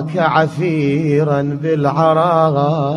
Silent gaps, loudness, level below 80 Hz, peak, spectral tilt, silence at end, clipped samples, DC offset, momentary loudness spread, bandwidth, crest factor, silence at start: none; -15 LUFS; -54 dBFS; 0 dBFS; -8 dB/octave; 0 s; under 0.1%; under 0.1%; 4 LU; 10 kHz; 14 dB; 0 s